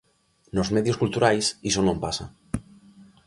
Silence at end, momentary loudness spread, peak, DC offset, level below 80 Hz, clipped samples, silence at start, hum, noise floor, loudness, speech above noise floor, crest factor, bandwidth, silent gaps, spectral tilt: 0.25 s; 13 LU; -6 dBFS; under 0.1%; -46 dBFS; under 0.1%; 0.55 s; none; -52 dBFS; -25 LUFS; 28 dB; 20 dB; 11.5 kHz; none; -4.5 dB/octave